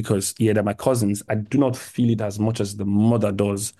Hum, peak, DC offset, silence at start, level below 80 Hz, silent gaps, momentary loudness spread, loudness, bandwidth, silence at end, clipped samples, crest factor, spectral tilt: none; -4 dBFS; under 0.1%; 0 s; -56 dBFS; none; 4 LU; -22 LUFS; 12.5 kHz; 0.1 s; under 0.1%; 18 dB; -6 dB/octave